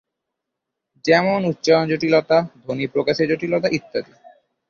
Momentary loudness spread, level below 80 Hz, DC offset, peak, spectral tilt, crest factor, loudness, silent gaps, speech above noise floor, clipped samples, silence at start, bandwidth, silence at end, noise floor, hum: 11 LU; -60 dBFS; under 0.1%; -2 dBFS; -6 dB/octave; 18 dB; -19 LUFS; none; 62 dB; under 0.1%; 1.05 s; 7.2 kHz; 0.65 s; -81 dBFS; none